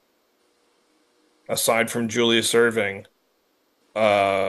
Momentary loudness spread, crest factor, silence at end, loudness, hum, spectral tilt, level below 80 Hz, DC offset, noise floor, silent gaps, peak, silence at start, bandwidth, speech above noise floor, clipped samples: 10 LU; 20 dB; 0 s; -21 LUFS; none; -3 dB/octave; -72 dBFS; under 0.1%; -67 dBFS; none; -4 dBFS; 1.5 s; 13 kHz; 46 dB; under 0.1%